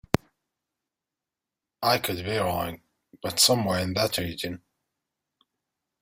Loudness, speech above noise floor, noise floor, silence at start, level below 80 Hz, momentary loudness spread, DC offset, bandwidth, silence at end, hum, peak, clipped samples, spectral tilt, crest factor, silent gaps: -25 LUFS; 63 dB; -88 dBFS; 1.8 s; -56 dBFS; 15 LU; under 0.1%; 16.5 kHz; 1.45 s; none; -2 dBFS; under 0.1%; -3.5 dB/octave; 28 dB; none